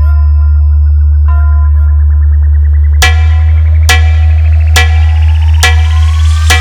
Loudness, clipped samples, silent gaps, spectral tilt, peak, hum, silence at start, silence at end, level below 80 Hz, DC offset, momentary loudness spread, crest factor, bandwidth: -8 LUFS; 0.5%; none; -4 dB/octave; 0 dBFS; none; 0 s; 0 s; -6 dBFS; under 0.1%; 2 LU; 6 dB; 14.5 kHz